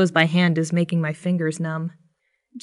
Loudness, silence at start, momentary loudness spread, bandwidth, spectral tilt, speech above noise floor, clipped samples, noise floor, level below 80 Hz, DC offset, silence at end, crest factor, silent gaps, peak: -22 LUFS; 0 s; 10 LU; 11.5 kHz; -6 dB/octave; 46 dB; under 0.1%; -67 dBFS; -74 dBFS; under 0.1%; 0.05 s; 18 dB; none; -4 dBFS